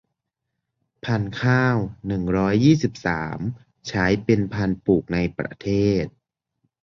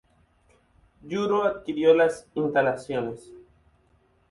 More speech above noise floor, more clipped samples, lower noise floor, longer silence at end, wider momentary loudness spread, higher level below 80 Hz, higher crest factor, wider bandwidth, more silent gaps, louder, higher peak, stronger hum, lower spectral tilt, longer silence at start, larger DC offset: first, 59 dB vs 40 dB; neither; first, -80 dBFS vs -64 dBFS; second, 0.75 s vs 0.9 s; about the same, 11 LU vs 13 LU; first, -44 dBFS vs -62 dBFS; about the same, 18 dB vs 20 dB; second, 7.4 kHz vs 11.5 kHz; neither; about the same, -22 LUFS vs -24 LUFS; first, -4 dBFS vs -8 dBFS; neither; about the same, -7 dB/octave vs -6 dB/octave; about the same, 1.05 s vs 1.05 s; neither